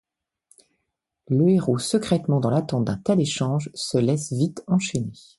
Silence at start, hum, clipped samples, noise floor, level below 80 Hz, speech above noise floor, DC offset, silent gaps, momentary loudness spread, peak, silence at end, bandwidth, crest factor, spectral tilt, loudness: 1.3 s; none; under 0.1%; -79 dBFS; -56 dBFS; 57 dB; under 0.1%; none; 6 LU; -8 dBFS; 0.25 s; 11.5 kHz; 16 dB; -6 dB/octave; -23 LUFS